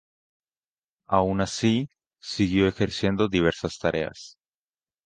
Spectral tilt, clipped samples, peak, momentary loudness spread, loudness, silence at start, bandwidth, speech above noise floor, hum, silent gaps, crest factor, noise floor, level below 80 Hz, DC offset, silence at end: -5.5 dB/octave; under 0.1%; -6 dBFS; 14 LU; -25 LUFS; 1.1 s; 9.6 kHz; over 66 dB; none; none; 20 dB; under -90 dBFS; -48 dBFS; under 0.1%; 0.75 s